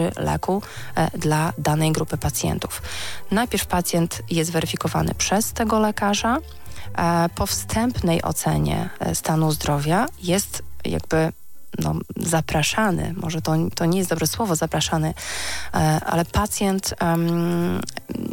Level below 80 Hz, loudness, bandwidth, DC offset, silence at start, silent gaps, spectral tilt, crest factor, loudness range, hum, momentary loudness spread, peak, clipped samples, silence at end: -40 dBFS; -22 LUFS; 17 kHz; under 0.1%; 0 s; none; -4.5 dB/octave; 16 dB; 2 LU; none; 7 LU; -6 dBFS; under 0.1%; 0 s